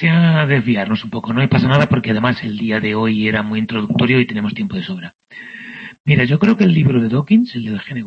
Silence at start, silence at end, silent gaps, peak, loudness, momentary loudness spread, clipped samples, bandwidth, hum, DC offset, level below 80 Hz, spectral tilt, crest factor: 0 s; 0 s; 5.15-5.19 s, 6.00-6.04 s; 0 dBFS; -15 LUFS; 15 LU; under 0.1%; 6.6 kHz; none; under 0.1%; -48 dBFS; -8.5 dB/octave; 16 dB